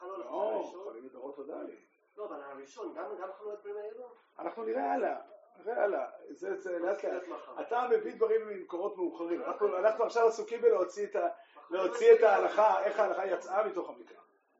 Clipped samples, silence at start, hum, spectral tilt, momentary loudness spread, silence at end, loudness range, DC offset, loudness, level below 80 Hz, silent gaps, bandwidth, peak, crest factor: under 0.1%; 0 s; none; -2 dB/octave; 18 LU; 0.45 s; 15 LU; under 0.1%; -31 LUFS; under -90 dBFS; none; 7.6 kHz; -12 dBFS; 20 dB